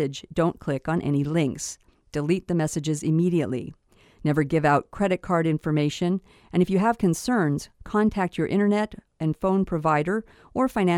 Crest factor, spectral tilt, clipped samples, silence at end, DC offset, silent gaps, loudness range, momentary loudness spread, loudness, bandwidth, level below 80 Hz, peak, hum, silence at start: 16 dB; -6.5 dB/octave; under 0.1%; 0 s; under 0.1%; none; 2 LU; 8 LU; -25 LUFS; 14 kHz; -50 dBFS; -8 dBFS; none; 0 s